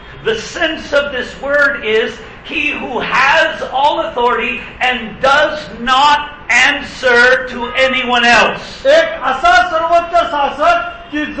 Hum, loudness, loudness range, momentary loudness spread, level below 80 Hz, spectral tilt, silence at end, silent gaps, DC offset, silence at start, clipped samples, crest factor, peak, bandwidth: none; -13 LUFS; 3 LU; 9 LU; -40 dBFS; -2.5 dB/octave; 0 s; none; under 0.1%; 0 s; under 0.1%; 14 dB; 0 dBFS; 8.8 kHz